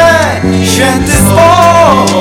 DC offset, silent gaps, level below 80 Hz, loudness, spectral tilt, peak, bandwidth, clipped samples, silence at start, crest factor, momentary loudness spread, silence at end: under 0.1%; none; -24 dBFS; -6 LUFS; -4.5 dB/octave; 0 dBFS; over 20 kHz; 9%; 0 s; 6 dB; 5 LU; 0 s